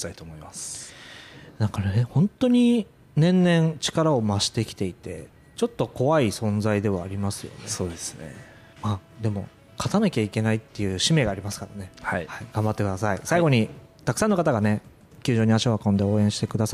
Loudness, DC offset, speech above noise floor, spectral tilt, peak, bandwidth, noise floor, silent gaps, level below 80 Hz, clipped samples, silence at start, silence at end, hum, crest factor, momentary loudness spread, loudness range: -24 LUFS; under 0.1%; 21 dB; -5.5 dB/octave; -8 dBFS; 15 kHz; -45 dBFS; none; -54 dBFS; under 0.1%; 0 s; 0 s; none; 16 dB; 16 LU; 6 LU